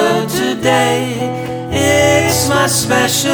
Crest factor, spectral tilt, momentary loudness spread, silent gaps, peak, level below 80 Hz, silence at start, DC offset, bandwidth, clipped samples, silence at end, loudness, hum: 14 dB; -3.5 dB/octave; 9 LU; none; 0 dBFS; -42 dBFS; 0 s; under 0.1%; over 20 kHz; under 0.1%; 0 s; -13 LUFS; none